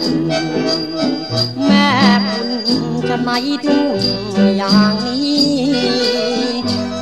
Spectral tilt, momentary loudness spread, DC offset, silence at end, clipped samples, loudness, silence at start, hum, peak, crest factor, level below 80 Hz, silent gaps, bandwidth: -5 dB/octave; 6 LU; 0.5%; 0 s; under 0.1%; -15 LUFS; 0 s; none; 0 dBFS; 14 dB; -48 dBFS; none; 12.5 kHz